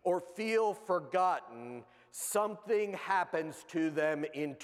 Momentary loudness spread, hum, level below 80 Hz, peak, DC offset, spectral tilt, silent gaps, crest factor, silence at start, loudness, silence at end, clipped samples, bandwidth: 14 LU; none; -86 dBFS; -18 dBFS; under 0.1%; -4 dB/octave; none; 16 dB; 0.05 s; -34 LUFS; 0 s; under 0.1%; 16 kHz